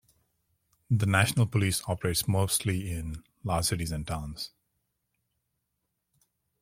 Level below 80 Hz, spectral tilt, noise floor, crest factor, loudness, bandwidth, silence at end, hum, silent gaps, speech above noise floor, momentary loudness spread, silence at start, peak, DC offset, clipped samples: -50 dBFS; -4.5 dB/octave; -81 dBFS; 24 dB; -28 LUFS; 16.5 kHz; 2.15 s; none; none; 53 dB; 14 LU; 0.9 s; -6 dBFS; under 0.1%; under 0.1%